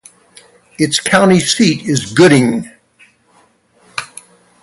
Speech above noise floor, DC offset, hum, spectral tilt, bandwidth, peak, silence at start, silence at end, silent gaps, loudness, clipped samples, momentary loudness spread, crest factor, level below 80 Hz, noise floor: 41 dB; under 0.1%; none; -4.5 dB/octave; 11.5 kHz; 0 dBFS; 0.8 s; 0.55 s; none; -12 LUFS; under 0.1%; 17 LU; 14 dB; -52 dBFS; -52 dBFS